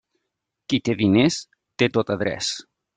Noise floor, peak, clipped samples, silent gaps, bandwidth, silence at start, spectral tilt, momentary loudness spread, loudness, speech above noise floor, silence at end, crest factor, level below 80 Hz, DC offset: -80 dBFS; -6 dBFS; under 0.1%; none; 9.4 kHz; 0.7 s; -5 dB/octave; 15 LU; -22 LUFS; 59 dB; 0.35 s; 18 dB; -58 dBFS; under 0.1%